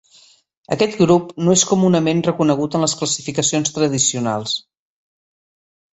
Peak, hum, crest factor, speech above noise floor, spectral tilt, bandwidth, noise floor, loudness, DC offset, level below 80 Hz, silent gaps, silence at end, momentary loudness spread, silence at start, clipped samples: -2 dBFS; none; 18 dB; 34 dB; -4 dB/octave; 8.2 kHz; -51 dBFS; -17 LUFS; under 0.1%; -56 dBFS; none; 1.35 s; 7 LU; 0.7 s; under 0.1%